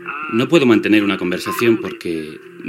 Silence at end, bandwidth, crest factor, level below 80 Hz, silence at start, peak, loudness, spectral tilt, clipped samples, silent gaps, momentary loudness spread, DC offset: 0 s; 17 kHz; 16 dB; -60 dBFS; 0 s; 0 dBFS; -16 LUFS; -5.5 dB/octave; under 0.1%; none; 12 LU; under 0.1%